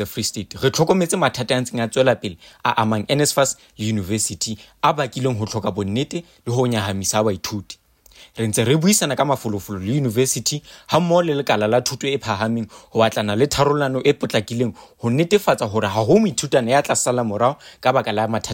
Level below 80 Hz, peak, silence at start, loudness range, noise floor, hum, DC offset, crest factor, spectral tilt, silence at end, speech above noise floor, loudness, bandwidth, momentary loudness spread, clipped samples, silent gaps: -52 dBFS; -4 dBFS; 0 s; 3 LU; -49 dBFS; none; under 0.1%; 16 dB; -4.5 dB/octave; 0 s; 29 dB; -20 LUFS; 16.5 kHz; 9 LU; under 0.1%; none